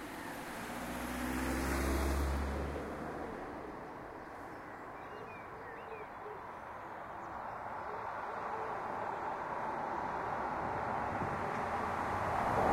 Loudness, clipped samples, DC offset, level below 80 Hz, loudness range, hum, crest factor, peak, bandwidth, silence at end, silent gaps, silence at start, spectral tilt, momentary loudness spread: -40 LUFS; under 0.1%; under 0.1%; -48 dBFS; 9 LU; none; 20 dB; -18 dBFS; 16 kHz; 0 s; none; 0 s; -5.5 dB/octave; 12 LU